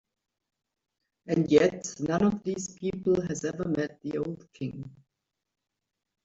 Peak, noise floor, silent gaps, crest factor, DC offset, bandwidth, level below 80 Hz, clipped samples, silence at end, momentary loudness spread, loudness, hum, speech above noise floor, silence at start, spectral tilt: -8 dBFS; -85 dBFS; none; 22 dB; under 0.1%; 8 kHz; -62 dBFS; under 0.1%; 1.35 s; 15 LU; -29 LUFS; none; 57 dB; 1.25 s; -6 dB/octave